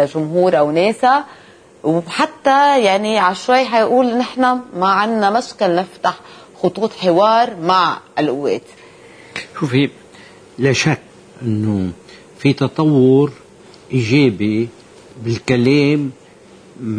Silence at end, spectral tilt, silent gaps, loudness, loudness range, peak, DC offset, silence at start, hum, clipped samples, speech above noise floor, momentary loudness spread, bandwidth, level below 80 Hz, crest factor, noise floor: 0 s; -6 dB/octave; none; -16 LUFS; 5 LU; -2 dBFS; under 0.1%; 0 s; none; under 0.1%; 28 dB; 11 LU; 10.5 kHz; -56 dBFS; 14 dB; -43 dBFS